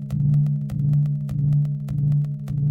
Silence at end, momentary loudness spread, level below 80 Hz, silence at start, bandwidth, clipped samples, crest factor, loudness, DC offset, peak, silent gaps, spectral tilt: 0 s; 4 LU; -44 dBFS; 0 s; 2.1 kHz; under 0.1%; 10 dB; -22 LUFS; under 0.1%; -12 dBFS; none; -10.5 dB/octave